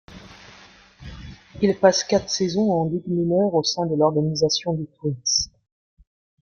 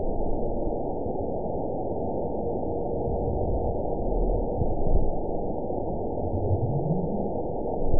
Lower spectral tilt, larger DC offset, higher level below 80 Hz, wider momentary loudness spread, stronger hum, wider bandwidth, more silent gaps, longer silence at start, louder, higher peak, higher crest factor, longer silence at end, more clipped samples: second, -4.5 dB/octave vs -18 dB/octave; second, under 0.1% vs 2%; second, -52 dBFS vs -32 dBFS; first, 22 LU vs 3 LU; neither; first, 7.2 kHz vs 1 kHz; neither; about the same, 0.1 s vs 0 s; first, -21 LUFS vs -29 LUFS; first, -2 dBFS vs -10 dBFS; about the same, 20 dB vs 16 dB; first, 0.95 s vs 0 s; neither